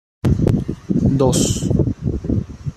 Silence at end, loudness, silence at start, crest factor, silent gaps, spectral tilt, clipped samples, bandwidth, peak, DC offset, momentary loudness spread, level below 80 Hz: 0.05 s; -18 LUFS; 0.25 s; 14 dB; none; -6.5 dB/octave; under 0.1%; 13.5 kHz; -2 dBFS; under 0.1%; 7 LU; -30 dBFS